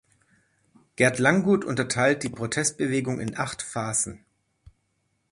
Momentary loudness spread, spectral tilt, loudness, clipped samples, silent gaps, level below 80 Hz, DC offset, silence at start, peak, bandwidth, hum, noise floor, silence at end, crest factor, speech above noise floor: 10 LU; -4 dB/octave; -25 LUFS; under 0.1%; none; -58 dBFS; under 0.1%; 1 s; -4 dBFS; 11.5 kHz; none; -73 dBFS; 1.15 s; 22 dB; 49 dB